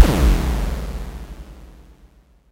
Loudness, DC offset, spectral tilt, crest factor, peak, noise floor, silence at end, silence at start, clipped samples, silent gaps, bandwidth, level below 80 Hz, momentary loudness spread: -21 LUFS; under 0.1%; -6 dB/octave; 20 dB; 0 dBFS; -51 dBFS; 0.8 s; 0 s; 0.1%; none; 16 kHz; -22 dBFS; 23 LU